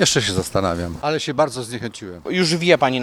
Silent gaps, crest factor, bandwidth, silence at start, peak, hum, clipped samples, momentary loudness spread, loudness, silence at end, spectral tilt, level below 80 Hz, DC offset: none; 20 dB; 16 kHz; 0 s; 0 dBFS; none; under 0.1%; 13 LU; -20 LUFS; 0 s; -4 dB/octave; -48 dBFS; under 0.1%